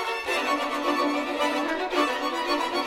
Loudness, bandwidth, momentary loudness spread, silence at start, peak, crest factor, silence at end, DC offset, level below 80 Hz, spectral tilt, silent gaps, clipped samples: -26 LUFS; 16 kHz; 2 LU; 0 s; -10 dBFS; 16 dB; 0 s; under 0.1%; -58 dBFS; -2 dB/octave; none; under 0.1%